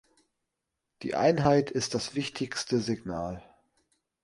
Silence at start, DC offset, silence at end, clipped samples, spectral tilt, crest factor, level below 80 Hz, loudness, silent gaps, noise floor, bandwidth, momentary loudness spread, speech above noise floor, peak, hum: 1 s; under 0.1%; 0.85 s; under 0.1%; -5 dB/octave; 22 dB; -58 dBFS; -29 LUFS; none; -85 dBFS; 11.5 kHz; 13 LU; 57 dB; -8 dBFS; none